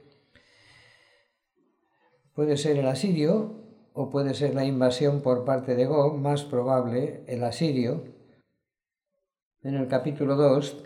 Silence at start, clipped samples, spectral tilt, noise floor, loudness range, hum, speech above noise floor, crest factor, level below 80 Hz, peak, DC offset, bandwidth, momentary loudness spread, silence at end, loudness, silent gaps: 2.35 s; under 0.1%; -7 dB/octave; -89 dBFS; 5 LU; none; 64 dB; 18 dB; -72 dBFS; -10 dBFS; under 0.1%; 12 kHz; 10 LU; 0 s; -26 LUFS; 9.42-9.51 s